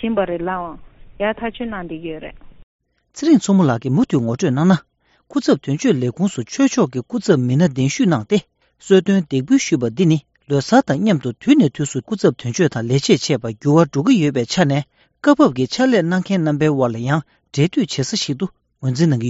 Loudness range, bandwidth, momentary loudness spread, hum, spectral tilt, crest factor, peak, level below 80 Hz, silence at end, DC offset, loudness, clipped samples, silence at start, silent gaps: 3 LU; 8 kHz; 10 LU; none; -6 dB/octave; 16 dB; 0 dBFS; -52 dBFS; 0 s; under 0.1%; -17 LUFS; under 0.1%; 0 s; 2.63-2.79 s